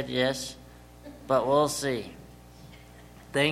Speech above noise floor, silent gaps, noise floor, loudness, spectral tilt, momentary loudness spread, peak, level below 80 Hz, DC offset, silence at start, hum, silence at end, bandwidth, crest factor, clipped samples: 23 dB; none; -50 dBFS; -28 LUFS; -4 dB/octave; 25 LU; -8 dBFS; -54 dBFS; under 0.1%; 0 s; 60 Hz at -50 dBFS; 0 s; 16.5 kHz; 20 dB; under 0.1%